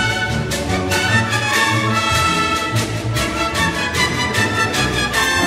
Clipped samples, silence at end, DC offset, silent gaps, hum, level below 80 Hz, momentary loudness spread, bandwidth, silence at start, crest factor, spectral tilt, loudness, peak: under 0.1%; 0 s; under 0.1%; none; none; -34 dBFS; 5 LU; 16 kHz; 0 s; 16 dB; -3.5 dB/octave; -17 LUFS; -2 dBFS